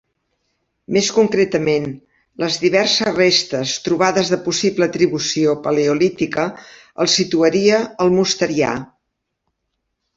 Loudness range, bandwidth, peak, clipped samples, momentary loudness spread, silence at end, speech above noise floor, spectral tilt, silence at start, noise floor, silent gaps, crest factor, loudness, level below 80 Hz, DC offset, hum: 1 LU; 8 kHz; -2 dBFS; under 0.1%; 7 LU; 1.3 s; 58 dB; -4 dB/octave; 0.9 s; -75 dBFS; none; 16 dB; -17 LUFS; -56 dBFS; under 0.1%; none